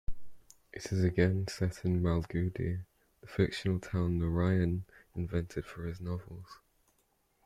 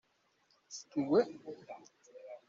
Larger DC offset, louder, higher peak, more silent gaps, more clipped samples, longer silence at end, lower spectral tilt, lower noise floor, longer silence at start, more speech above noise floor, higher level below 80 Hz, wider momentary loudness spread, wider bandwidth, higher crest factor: neither; about the same, -34 LUFS vs -34 LUFS; first, -14 dBFS vs -18 dBFS; neither; neither; first, 0.9 s vs 0.1 s; first, -7.5 dB/octave vs -5.5 dB/octave; about the same, -74 dBFS vs -74 dBFS; second, 0.1 s vs 0.7 s; about the same, 42 dB vs 39 dB; first, -50 dBFS vs -80 dBFS; second, 15 LU vs 22 LU; first, 12 kHz vs 7.6 kHz; about the same, 20 dB vs 20 dB